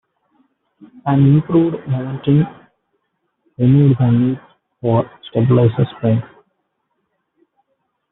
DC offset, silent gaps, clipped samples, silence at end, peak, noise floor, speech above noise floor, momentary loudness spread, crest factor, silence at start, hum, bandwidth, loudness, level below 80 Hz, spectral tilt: under 0.1%; none; under 0.1%; 1.85 s; -2 dBFS; -70 dBFS; 56 dB; 10 LU; 14 dB; 1.05 s; none; 4 kHz; -16 LUFS; -52 dBFS; -9.5 dB/octave